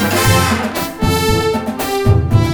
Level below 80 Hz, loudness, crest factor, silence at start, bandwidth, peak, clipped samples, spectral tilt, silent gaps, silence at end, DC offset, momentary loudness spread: -26 dBFS; -15 LUFS; 14 dB; 0 s; over 20 kHz; 0 dBFS; under 0.1%; -5 dB/octave; none; 0 s; under 0.1%; 7 LU